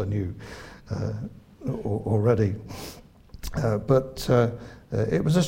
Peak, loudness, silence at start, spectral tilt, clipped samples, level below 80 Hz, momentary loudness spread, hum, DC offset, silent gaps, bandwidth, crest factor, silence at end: -6 dBFS; -26 LUFS; 0 s; -7 dB/octave; under 0.1%; -46 dBFS; 18 LU; none; under 0.1%; none; 16 kHz; 20 dB; 0 s